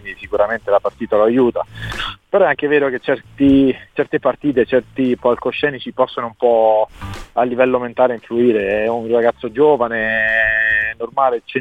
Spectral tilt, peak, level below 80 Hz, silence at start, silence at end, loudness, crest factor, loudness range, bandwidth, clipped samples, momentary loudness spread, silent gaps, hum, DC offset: -7 dB/octave; -2 dBFS; -44 dBFS; 0.05 s; 0 s; -16 LUFS; 14 dB; 2 LU; 9.2 kHz; under 0.1%; 7 LU; none; none; 0.1%